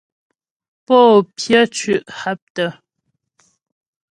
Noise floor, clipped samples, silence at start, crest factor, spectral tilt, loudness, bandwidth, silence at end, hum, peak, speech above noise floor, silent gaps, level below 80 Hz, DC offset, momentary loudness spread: -73 dBFS; under 0.1%; 0.9 s; 18 dB; -4 dB/octave; -15 LUFS; 11.5 kHz; 1.45 s; none; 0 dBFS; 58 dB; 2.42-2.55 s; -62 dBFS; under 0.1%; 14 LU